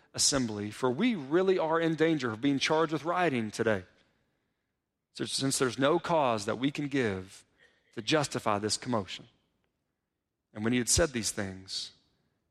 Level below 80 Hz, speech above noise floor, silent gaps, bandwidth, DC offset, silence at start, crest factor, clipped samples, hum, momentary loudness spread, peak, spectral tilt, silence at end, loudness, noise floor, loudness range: -56 dBFS; 55 dB; none; 14.5 kHz; under 0.1%; 0.15 s; 20 dB; under 0.1%; none; 12 LU; -10 dBFS; -3.5 dB/octave; 0.6 s; -29 LUFS; -85 dBFS; 5 LU